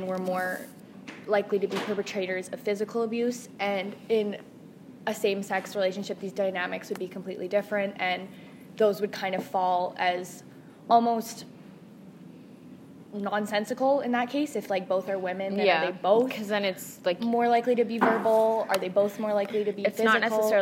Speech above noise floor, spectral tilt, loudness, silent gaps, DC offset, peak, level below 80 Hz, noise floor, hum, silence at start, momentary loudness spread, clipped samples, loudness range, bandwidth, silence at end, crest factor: 21 dB; -4.5 dB/octave; -27 LUFS; none; under 0.1%; -8 dBFS; -80 dBFS; -48 dBFS; none; 0 s; 13 LU; under 0.1%; 6 LU; 16 kHz; 0 s; 20 dB